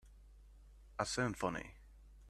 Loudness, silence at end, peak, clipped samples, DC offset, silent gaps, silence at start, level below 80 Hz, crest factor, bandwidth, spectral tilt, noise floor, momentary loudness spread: -40 LUFS; 0 s; -20 dBFS; under 0.1%; under 0.1%; none; 0.05 s; -58 dBFS; 24 dB; 13.5 kHz; -4 dB/octave; -60 dBFS; 17 LU